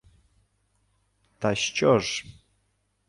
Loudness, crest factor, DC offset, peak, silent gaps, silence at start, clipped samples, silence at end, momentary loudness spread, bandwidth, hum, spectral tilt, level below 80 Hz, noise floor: -25 LUFS; 22 dB; under 0.1%; -8 dBFS; none; 1.4 s; under 0.1%; 0.75 s; 9 LU; 11.5 kHz; 50 Hz at -55 dBFS; -4 dB/octave; -60 dBFS; -72 dBFS